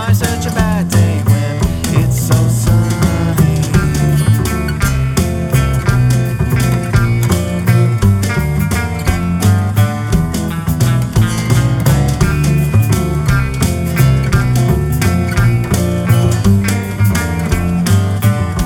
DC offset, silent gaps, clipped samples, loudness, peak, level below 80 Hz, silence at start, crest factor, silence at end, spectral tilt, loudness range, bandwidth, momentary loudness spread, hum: under 0.1%; none; under 0.1%; -13 LUFS; 0 dBFS; -24 dBFS; 0 s; 12 dB; 0 s; -6 dB/octave; 1 LU; 17.5 kHz; 4 LU; none